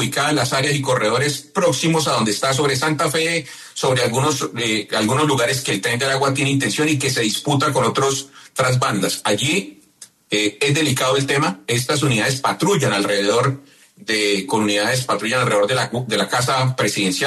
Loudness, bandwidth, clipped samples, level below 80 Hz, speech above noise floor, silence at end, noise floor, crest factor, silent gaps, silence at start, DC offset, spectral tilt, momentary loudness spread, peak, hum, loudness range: -18 LUFS; 13.5 kHz; under 0.1%; -56 dBFS; 28 dB; 0 s; -46 dBFS; 14 dB; none; 0 s; under 0.1%; -4 dB/octave; 4 LU; -6 dBFS; none; 1 LU